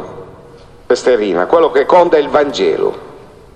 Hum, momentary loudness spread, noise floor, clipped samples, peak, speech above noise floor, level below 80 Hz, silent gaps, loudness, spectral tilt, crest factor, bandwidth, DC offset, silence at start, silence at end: none; 16 LU; -38 dBFS; under 0.1%; 0 dBFS; 27 dB; -46 dBFS; none; -12 LUFS; -4.5 dB/octave; 14 dB; 9.6 kHz; under 0.1%; 0 s; 0.35 s